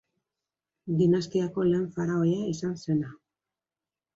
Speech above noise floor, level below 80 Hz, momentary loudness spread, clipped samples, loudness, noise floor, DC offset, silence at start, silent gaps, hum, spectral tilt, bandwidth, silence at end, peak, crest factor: over 64 dB; -64 dBFS; 8 LU; under 0.1%; -27 LUFS; under -90 dBFS; under 0.1%; 0.85 s; none; none; -7.5 dB/octave; 7.8 kHz; 1 s; -12 dBFS; 16 dB